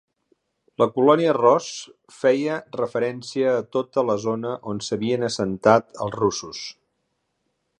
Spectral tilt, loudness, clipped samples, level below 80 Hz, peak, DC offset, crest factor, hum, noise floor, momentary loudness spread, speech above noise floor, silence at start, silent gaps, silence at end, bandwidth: -5 dB/octave; -22 LUFS; under 0.1%; -62 dBFS; 0 dBFS; under 0.1%; 22 dB; none; -74 dBFS; 15 LU; 52 dB; 0.8 s; none; 1.1 s; 10 kHz